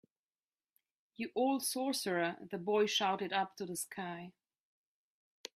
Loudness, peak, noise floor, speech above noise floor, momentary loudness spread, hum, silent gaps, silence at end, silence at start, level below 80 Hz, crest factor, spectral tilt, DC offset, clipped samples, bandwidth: -36 LUFS; -20 dBFS; under -90 dBFS; over 54 dB; 13 LU; none; none; 1.25 s; 1.2 s; -84 dBFS; 18 dB; -3 dB/octave; under 0.1%; under 0.1%; 15.5 kHz